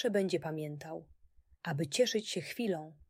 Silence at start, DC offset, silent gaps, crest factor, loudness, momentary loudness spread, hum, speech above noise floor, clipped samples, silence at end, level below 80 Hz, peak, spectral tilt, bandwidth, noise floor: 0 s; under 0.1%; none; 18 dB; -35 LUFS; 14 LU; none; 21 dB; under 0.1%; 0.15 s; -70 dBFS; -18 dBFS; -4.5 dB/octave; 16 kHz; -56 dBFS